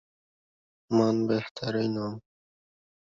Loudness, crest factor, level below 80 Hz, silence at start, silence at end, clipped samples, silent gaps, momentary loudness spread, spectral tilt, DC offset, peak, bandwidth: -28 LUFS; 20 dB; -68 dBFS; 0.9 s; 0.95 s; under 0.1%; 1.51-1.55 s; 11 LU; -7 dB/octave; under 0.1%; -12 dBFS; 7.4 kHz